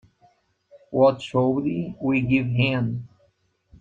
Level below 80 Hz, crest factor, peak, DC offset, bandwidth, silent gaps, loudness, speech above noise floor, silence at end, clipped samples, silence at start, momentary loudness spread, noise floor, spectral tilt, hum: -54 dBFS; 18 dB; -6 dBFS; under 0.1%; 7.8 kHz; none; -23 LUFS; 44 dB; 0.75 s; under 0.1%; 0.75 s; 9 LU; -66 dBFS; -8 dB/octave; none